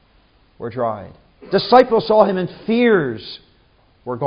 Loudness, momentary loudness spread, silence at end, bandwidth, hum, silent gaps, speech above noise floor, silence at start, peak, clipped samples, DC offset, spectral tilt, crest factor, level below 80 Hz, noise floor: -16 LUFS; 20 LU; 0 s; 5.4 kHz; none; none; 39 dB; 0.6 s; 0 dBFS; under 0.1%; under 0.1%; -8 dB/octave; 18 dB; -54 dBFS; -55 dBFS